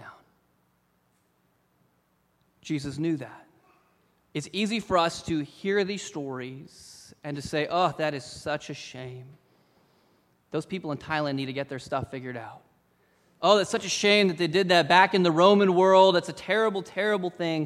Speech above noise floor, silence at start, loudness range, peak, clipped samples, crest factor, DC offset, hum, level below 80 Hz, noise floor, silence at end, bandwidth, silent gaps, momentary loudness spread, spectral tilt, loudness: 44 dB; 0 s; 16 LU; -4 dBFS; under 0.1%; 22 dB; under 0.1%; none; -62 dBFS; -69 dBFS; 0 s; 13 kHz; none; 19 LU; -4.5 dB/octave; -25 LUFS